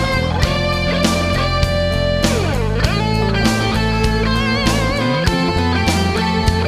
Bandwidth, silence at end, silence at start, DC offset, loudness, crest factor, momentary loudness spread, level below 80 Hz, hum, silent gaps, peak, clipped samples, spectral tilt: 15.5 kHz; 0 s; 0 s; under 0.1%; -16 LUFS; 16 dB; 1 LU; -24 dBFS; none; none; 0 dBFS; under 0.1%; -5 dB/octave